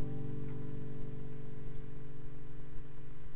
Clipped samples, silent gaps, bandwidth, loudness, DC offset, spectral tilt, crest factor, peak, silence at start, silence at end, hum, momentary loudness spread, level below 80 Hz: under 0.1%; none; 4 kHz; -47 LUFS; 3%; -10.5 dB/octave; 14 dB; -22 dBFS; 0 s; 0 s; none; 9 LU; -52 dBFS